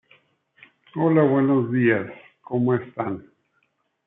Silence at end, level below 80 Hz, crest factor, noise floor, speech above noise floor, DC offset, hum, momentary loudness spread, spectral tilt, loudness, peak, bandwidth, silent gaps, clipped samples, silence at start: 0.85 s; -70 dBFS; 18 dB; -70 dBFS; 50 dB; under 0.1%; none; 15 LU; -12 dB/octave; -22 LUFS; -6 dBFS; 3.9 kHz; none; under 0.1%; 0.95 s